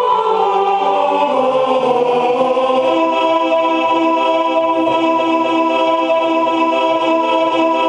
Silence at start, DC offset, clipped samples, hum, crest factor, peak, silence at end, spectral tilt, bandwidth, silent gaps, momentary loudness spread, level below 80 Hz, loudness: 0 s; under 0.1%; under 0.1%; none; 12 dB; -2 dBFS; 0 s; -4.5 dB/octave; 9.8 kHz; none; 1 LU; -64 dBFS; -14 LUFS